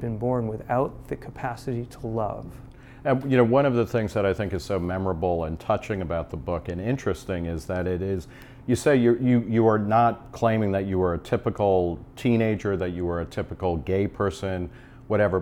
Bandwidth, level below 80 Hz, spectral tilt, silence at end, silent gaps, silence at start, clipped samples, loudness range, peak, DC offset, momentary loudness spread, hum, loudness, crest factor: 15.5 kHz; -46 dBFS; -7.5 dB/octave; 0 s; none; 0 s; under 0.1%; 5 LU; -8 dBFS; under 0.1%; 12 LU; none; -25 LUFS; 18 dB